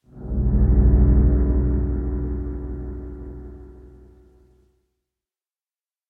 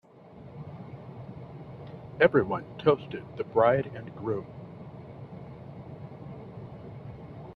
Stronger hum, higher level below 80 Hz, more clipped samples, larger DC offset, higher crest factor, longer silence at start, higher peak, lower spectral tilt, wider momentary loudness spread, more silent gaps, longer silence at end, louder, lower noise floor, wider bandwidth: neither; first, -22 dBFS vs -60 dBFS; neither; neither; second, 16 dB vs 26 dB; second, 0.15 s vs 0.35 s; about the same, -6 dBFS vs -6 dBFS; first, -14 dB/octave vs -9 dB/octave; about the same, 21 LU vs 21 LU; neither; first, 2.25 s vs 0 s; first, -21 LUFS vs -27 LUFS; first, under -90 dBFS vs -49 dBFS; second, 2 kHz vs 5.2 kHz